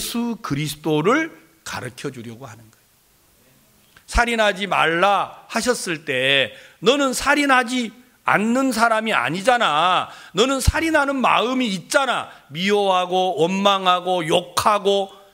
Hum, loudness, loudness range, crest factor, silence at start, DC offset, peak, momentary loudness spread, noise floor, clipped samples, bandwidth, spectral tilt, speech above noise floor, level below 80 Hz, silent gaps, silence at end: none; -19 LUFS; 7 LU; 20 dB; 0 s; under 0.1%; -2 dBFS; 12 LU; -57 dBFS; under 0.1%; 16 kHz; -3.5 dB/octave; 38 dB; -38 dBFS; none; 0.2 s